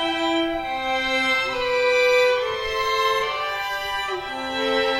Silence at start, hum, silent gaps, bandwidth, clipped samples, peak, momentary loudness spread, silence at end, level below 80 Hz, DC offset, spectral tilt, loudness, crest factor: 0 s; none; none; 16.5 kHz; under 0.1%; -8 dBFS; 8 LU; 0 s; -48 dBFS; under 0.1%; -2.5 dB/octave; -22 LUFS; 14 dB